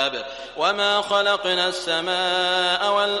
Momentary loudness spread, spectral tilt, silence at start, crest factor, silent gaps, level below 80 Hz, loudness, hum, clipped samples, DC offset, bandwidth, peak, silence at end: 5 LU; -2 dB/octave; 0 s; 16 dB; none; -60 dBFS; -20 LUFS; none; under 0.1%; under 0.1%; 11.5 kHz; -6 dBFS; 0 s